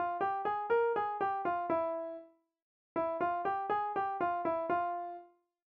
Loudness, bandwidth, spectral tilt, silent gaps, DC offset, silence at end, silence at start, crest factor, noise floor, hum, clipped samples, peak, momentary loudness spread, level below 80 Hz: -34 LUFS; 5.4 kHz; -4 dB/octave; 2.62-2.95 s; under 0.1%; 0.45 s; 0 s; 14 dB; -56 dBFS; none; under 0.1%; -22 dBFS; 10 LU; -74 dBFS